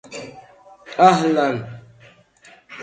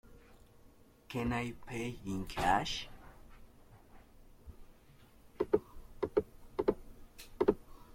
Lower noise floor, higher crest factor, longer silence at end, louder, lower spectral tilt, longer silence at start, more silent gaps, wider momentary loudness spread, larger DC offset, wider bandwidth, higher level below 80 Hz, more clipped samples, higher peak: second, -50 dBFS vs -61 dBFS; about the same, 20 dB vs 24 dB; about the same, 0 s vs 0 s; first, -17 LUFS vs -36 LUFS; about the same, -5.5 dB/octave vs -5.5 dB/octave; about the same, 0.1 s vs 0.1 s; neither; about the same, 24 LU vs 25 LU; neither; second, 9.2 kHz vs 16.5 kHz; second, -62 dBFS vs -54 dBFS; neither; first, 0 dBFS vs -14 dBFS